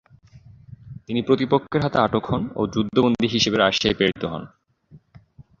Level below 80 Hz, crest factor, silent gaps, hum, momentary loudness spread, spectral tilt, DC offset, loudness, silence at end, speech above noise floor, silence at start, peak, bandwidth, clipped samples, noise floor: -50 dBFS; 20 dB; none; none; 11 LU; -5 dB/octave; under 0.1%; -21 LUFS; 0.65 s; 31 dB; 0.35 s; -2 dBFS; 7.4 kHz; under 0.1%; -52 dBFS